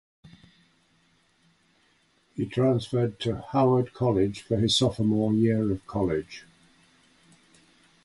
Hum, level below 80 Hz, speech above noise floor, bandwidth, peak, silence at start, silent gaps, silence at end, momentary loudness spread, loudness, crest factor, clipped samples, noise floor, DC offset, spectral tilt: none; -52 dBFS; 41 dB; 11.5 kHz; -10 dBFS; 2.35 s; none; 1.65 s; 9 LU; -25 LUFS; 18 dB; under 0.1%; -66 dBFS; under 0.1%; -6.5 dB/octave